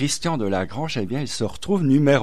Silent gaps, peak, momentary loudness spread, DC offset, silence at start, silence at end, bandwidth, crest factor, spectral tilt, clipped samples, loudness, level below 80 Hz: none; -6 dBFS; 9 LU; 2%; 0 s; 0 s; 14.5 kHz; 16 dB; -5.5 dB/octave; under 0.1%; -23 LUFS; -50 dBFS